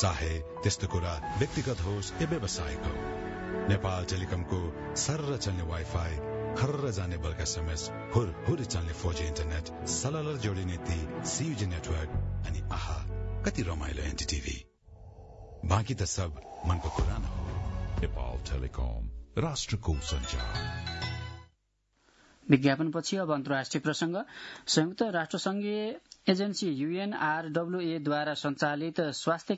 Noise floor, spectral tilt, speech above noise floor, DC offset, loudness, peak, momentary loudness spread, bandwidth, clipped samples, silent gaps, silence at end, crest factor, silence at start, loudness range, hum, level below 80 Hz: -74 dBFS; -5 dB/octave; 42 dB; under 0.1%; -32 LUFS; -6 dBFS; 6 LU; 8 kHz; under 0.1%; none; 0 s; 24 dB; 0 s; 4 LU; none; -42 dBFS